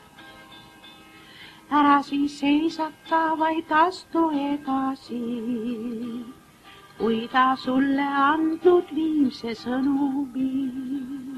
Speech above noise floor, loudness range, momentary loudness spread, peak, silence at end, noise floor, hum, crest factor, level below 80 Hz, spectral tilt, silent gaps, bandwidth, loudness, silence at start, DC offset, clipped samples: 26 dB; 4 LU; 12 LU; -6 dBFS; 0 s; -49 dBFS; none; 18 dB; -62 dBFS; -5.5 dB/octave; none; 13 kHz; -24 LUFS; 0.2 s; under 0.1%; under 0.1%